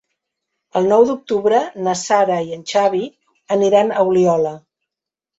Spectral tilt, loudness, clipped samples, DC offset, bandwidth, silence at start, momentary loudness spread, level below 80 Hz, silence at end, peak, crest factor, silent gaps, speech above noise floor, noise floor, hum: -5 dB/octave; -17 LUFS; under 0.1%; under 0.1%; 8 kHz; 0.75 s; 8 LU; -62 dBFS; 0.8 s; -2 dBFS; 16 dB; none; 70 dB; -85 dBFS; none